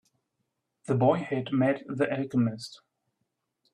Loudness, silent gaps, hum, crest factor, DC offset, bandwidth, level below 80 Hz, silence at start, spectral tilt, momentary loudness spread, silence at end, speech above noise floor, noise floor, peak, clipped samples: -28 LUFS; none; none; 18 dB; under 0.1%; 11 kHz; -70 dBFS; 0.9 s; -7.5 dB/octave; 16 LU; 0.95 s; 54 dB; -81 dBFS; -10 dBFS; under 0.1%